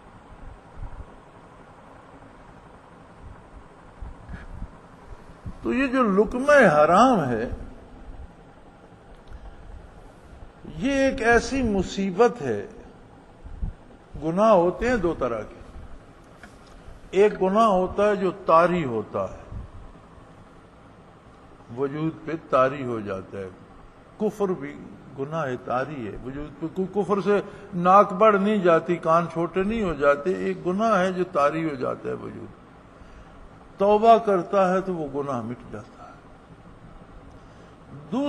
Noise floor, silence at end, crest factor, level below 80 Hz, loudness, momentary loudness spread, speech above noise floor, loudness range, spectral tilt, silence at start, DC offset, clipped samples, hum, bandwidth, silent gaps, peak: -49 dBFS; 0 s; 22 dB; -44 dBFS; -22 LUFS; 24 LU; 27 dB; 10 LU; -6.5 dB/octave; 0.15 s; under 0.1%; under 0.1%; none; 11 kHz; none; -4 dBFS